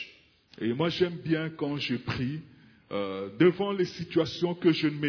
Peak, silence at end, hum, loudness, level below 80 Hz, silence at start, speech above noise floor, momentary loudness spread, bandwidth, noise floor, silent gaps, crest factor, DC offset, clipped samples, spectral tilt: -10 dBFS; 0 s; none; -29 LUFS; -62 dBFS; 0 s; 29 dB; 10 LU; 5.4 kHz; -57 dBFS; none; 20 dB; under 0.1%; under 0.1%; -7 dB/octave